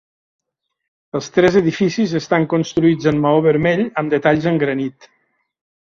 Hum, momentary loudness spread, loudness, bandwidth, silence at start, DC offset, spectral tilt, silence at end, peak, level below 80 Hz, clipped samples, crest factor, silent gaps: none; 6 LU; -16 LUFS; 7.4 kHz; 1.15 s; under 0.1%; -6.5 dB/octave; 1.05 s; 0 dBFS; -52 dBFS; under 0.1%; 16 dB; none